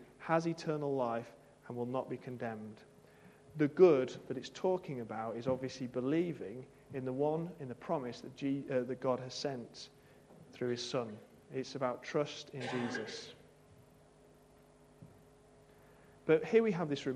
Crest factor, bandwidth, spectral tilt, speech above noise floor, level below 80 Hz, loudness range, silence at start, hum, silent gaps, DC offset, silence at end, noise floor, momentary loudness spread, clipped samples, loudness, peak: 24 dB; 11 kHz; -6 dB/octave; 27 dB; -74 dBFS; 8 LU; 0 s; none; none; under 0.1%; 0 s; -63 dBFS; 16 LU; under 0.1%; -36 LUFS; -14 dBFS